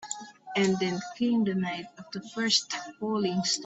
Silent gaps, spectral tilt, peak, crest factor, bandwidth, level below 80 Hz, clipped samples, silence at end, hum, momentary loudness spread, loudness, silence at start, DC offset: none; -3.5 dB/octave; -10 dBFS; 20 dB; 8.4 kHz; -70 dBFS; under 0.1%; 0 s; none; 13 LU; -29 LUFS; 0 s; under 0.1%